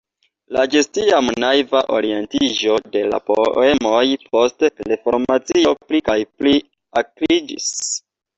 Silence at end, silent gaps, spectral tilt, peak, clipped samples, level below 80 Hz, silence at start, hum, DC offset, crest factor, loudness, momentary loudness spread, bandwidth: 0.4 s; none; -3 dB/octave; -2 dBFS; under 0.1%; -52 dBFS; 0.5 s; none; under 0.1%; 16 dB; -17 LUFS; 6 LU; 8.4 kHz